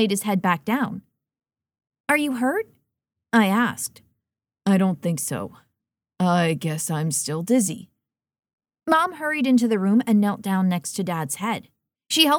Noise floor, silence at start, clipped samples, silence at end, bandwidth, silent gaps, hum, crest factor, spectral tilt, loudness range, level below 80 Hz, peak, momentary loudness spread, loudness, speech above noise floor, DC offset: -83 dBFS; 0 s; under 0.1%; 0 s; 19 kHz; 2.00-2.04 s, 8.53-8.58 s; none; 20 dB; -4.5 dB/octave; 3 LU; -70 dBFS; -4 dBFS; 11 LU; -22 LUFS; 62 dB; under 0.1%